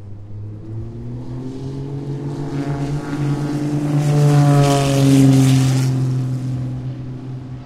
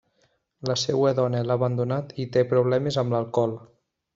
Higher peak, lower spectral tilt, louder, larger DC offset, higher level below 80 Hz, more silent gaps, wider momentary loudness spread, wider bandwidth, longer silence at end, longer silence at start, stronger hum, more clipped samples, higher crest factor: first, -2 dBFS vs -8 dBFS; about the same, -7 dB/octave vs -6 dB/octave; first, -17 LUFS vs -24 LUFS; neither; first, -42 dBFS vs -62 dBFS; neither; first, 18 LU vs 7 LU; first, 14 kHz vs 7.8 kHz; second, 0 s vs 0.5 s; second, 0 s vs 0.6 s; neither; neither; about the same, 16 dB vs 16 dB